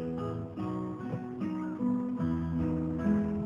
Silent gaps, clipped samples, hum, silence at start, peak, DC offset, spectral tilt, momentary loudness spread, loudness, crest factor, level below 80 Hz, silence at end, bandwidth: none; under 0.1%; none; 0 s; -18 dBFS; under 0.1%; -10 dB/octave; 7 LU; -33 LUFS; 14 dB; -54 dBFS; 0 s; 7.2 kHz